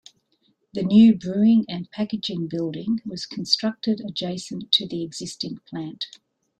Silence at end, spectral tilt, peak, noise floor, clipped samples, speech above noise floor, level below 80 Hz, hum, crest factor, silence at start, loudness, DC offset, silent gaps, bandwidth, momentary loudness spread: 0.55 s; -5.5 dB/octave; -4 dBFS; -67 dBFS; under 0.1%; 45 dB; -62 dBFS; none; 20 dB; 0.75 s; -23 LUFS; under 0.1%; none; 9.2 kHz; 16 LU